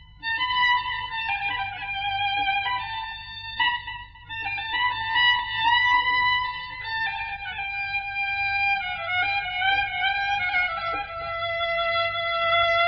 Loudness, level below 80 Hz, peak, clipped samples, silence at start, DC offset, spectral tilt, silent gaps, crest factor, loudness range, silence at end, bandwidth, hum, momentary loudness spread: -24 LUFS; -50 dBFS; -10 dBFS; under 0.1%; 0 s; under 0.1%; 2 dB/octave; none; 16 dB; 4 LU; 0 s; 6.4 kHz; none; 10 LU